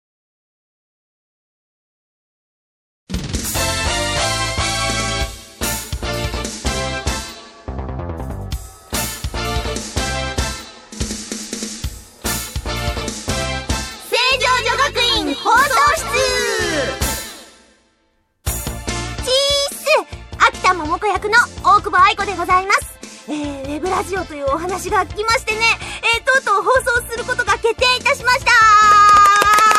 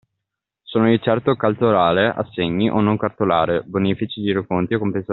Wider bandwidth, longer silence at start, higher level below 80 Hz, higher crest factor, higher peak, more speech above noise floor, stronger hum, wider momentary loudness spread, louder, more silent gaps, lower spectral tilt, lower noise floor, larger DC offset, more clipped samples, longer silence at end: first, 16 kHz vs 4.3 kHz; first, 3.1 s vs 0.7 s; first, -32 dBFS vs -54 dBFS; about the same, 18 dB vs 18 dB; about the same, 0 dBFS vs -2 dBFS; second, 45 dB vs 63 dB; neither; first, 15 LU vs 6 LU; first, -16 LUFS vs -19 LUFS; neither; second, -2.5 dB/octave vs -5 dB/octave; second, -63 dBFS vs -81 dBFS; neither; neither; about the same, 0 s vs 0 s